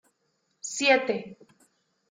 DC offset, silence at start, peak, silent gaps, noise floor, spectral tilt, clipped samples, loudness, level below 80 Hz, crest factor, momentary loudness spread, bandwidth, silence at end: under 0.1%; 0.65 s; -8 dBFS; none; -74 dBFS; -2 dB/octave; under 0.1%; -25 LUFS; -78 dBFS; 22 dB; 19 LU; 9.6 kHz; 0.75 s